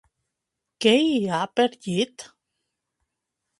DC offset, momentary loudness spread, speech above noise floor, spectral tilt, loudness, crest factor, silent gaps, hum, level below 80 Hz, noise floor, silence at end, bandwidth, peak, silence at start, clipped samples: under 0.1%; 9 LU; 61 dB; -4.5 dB/octave; -23 LUFS; 22 dB; none; none; -70 dBFS; -83 dBFS; 1.35 s; 11.5 kHz; -4 dBFS; 0.8 s; under 0.1%